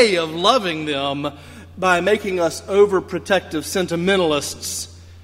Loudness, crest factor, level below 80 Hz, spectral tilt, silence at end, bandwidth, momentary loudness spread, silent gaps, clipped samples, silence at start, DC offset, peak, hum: -19 LUFS; 20 dB; -52 dBFS; -3.5 dB/octave; 0 s; 16 kHz; 11 LU; none; under 0.1%; 0 s; under 0.1%; 0 dBFS; none